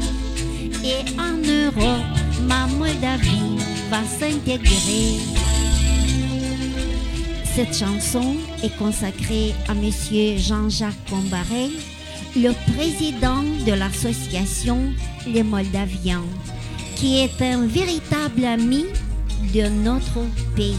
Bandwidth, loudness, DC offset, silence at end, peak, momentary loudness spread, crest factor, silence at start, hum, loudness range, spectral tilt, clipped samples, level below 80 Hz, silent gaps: 15 kHz; -21 LUFS; under 0.1%; 0 s; -2 dBFS; 7 LU; 18 dB; 0 s; none; 2 LU; -4.5 dB/octave; under 0.1%; -26 dBFS; none